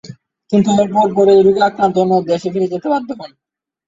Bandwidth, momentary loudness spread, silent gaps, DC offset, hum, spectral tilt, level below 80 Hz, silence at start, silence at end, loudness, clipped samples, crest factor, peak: 7.8 kHz; 9 LU; none; under 0.1%; none; -6.5 dB/octave; -56 dBFS; 0.05 s; 0.6 s; -14 LUFS; under 0.1%; 12 dB; -2 dBFS